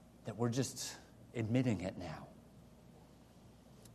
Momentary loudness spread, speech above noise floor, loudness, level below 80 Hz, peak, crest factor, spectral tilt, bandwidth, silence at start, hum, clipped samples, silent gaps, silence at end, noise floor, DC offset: 26 LU; 23 dB; -39 LUFS; -68 dBFS; -22 dBFS; 20 dB; -5.5 dB/octave; 13 kHz; 0 s; none; under 0.1%; none; 0 s; -61 dBFS; under 0.1%